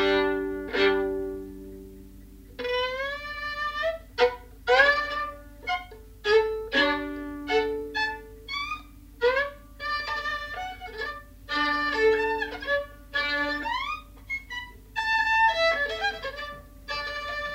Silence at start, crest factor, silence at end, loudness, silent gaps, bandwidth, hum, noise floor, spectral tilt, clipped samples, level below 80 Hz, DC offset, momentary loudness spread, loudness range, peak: 0 s; 22 dB; 0 s; -27 LUFS; none; 16 kHz; none; -47 dBFS; -3.5 dB/octave; under 0.1%; -48 dBFS; under 0.1%; 14 LU; 5 LU; -6 dBFS